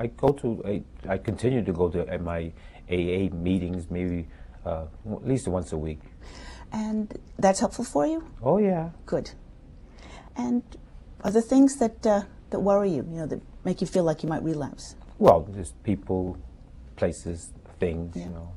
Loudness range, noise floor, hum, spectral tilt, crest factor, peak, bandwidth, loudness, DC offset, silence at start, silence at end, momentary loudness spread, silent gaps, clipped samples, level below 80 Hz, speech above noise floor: 5 LU; -47 dBFS; none; -7 dB/octave; 24 dB; -2 dBFS; 12 kHz; -27 LUFS; under 0.1%; 0 s; 0 s; 15 LU; none; under 0.1%; -46 dBFS; 21 dB